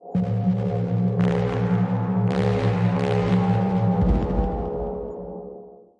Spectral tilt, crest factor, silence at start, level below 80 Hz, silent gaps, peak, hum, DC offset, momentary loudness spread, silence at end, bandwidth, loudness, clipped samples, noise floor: -9 dB/octave; 14 dB; 0 s; -34 dBFS; none; -8 dBFS; none; under 0.1%; 12 LU; 0.25 s; 7.2 kHz; -23 LUFS; under 0.1%; -43 dBFS